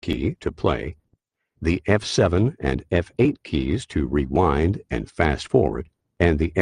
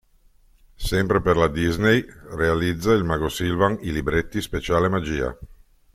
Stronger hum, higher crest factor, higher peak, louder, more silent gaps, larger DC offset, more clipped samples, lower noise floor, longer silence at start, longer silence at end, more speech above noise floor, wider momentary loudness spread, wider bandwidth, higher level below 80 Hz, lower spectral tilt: neither; about the same, 20 dB vs 18 dB; about the same, -2 dBFS vs -4 dBFS; about the same, -23 LUFS vs -22 LUFS; neither; neither; neither; first, -69 dBFS vs -56 dBFS; second, 0.05 s vs 0.8 s; second, 0 s vs 0.45 s; first, 48 dB vs 35 dB; about the same, 8 LU vs 8 LU; second, 11 kHz vs 16 kHz; about the same, -36 dBFS vs -38 dBFS; about the same, -6.5 dB/octave vs -6 dB/octave